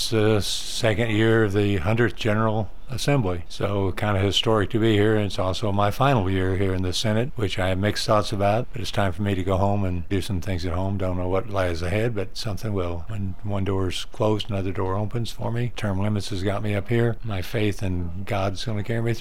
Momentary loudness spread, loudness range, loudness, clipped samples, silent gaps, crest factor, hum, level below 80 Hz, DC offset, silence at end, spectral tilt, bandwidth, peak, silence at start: 8 LU; 5 LU; -24 LUFS; under 0.1%; none; 18 dB; none; -38 dBFS; 3%; 0 s; -6 dB/octave; 15.5 kHz; -6 dBFS; 0 s